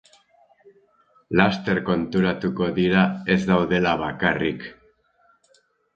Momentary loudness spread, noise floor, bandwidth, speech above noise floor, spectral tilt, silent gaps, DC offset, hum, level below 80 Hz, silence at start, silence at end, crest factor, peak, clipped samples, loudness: 5 LU; -63 dBFS; 7.2 kHz; 42 dB; -7 dB/octave; none; under 0.1%; none; -50 dBFS; 1.3 s; 1.25 s; 22 dB; 0 dBFS; under 0.1%; -22 LUFS